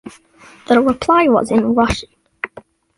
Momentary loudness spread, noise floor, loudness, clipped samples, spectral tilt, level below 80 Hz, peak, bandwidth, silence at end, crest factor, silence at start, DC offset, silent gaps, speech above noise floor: 16 LU; -45 dBFS; -15 LUFS; under 0.1%; -5.5 dB/octave; -40 dBFS; -2 dBFS; 11.5 kHz; 0.5 s; 14 dB; 0.05 s; under 0.1%; none; 31 dB